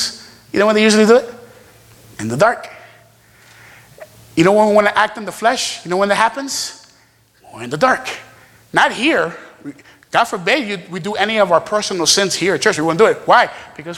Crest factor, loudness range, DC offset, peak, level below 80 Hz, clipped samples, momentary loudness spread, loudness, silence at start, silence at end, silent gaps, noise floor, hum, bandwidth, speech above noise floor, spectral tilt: 16 dB; 4 LU; under 0.1%; 0 dBFS; -56 dBFS; under 0.1%; 16 LU; -15 LUFS; 0 s; 0 s; none; -53 dBFS; none; 17 kHz; 38 dB; -3.5 dB/octave